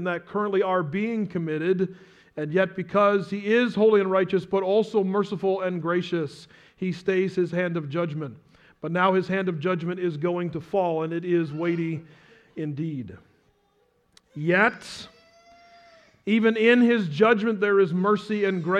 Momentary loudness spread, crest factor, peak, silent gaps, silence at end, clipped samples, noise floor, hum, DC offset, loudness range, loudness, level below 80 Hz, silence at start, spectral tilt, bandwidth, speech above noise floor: 13 LU; 18 dB; -6 dBFS; none; 0 s; under 0.1%; -66 dBFS; none; under 0.1%; 6 LU; -24 LUFS; -68 dBFS; 0 s; -7.5 dB/octave; 10 kHz; 43 dB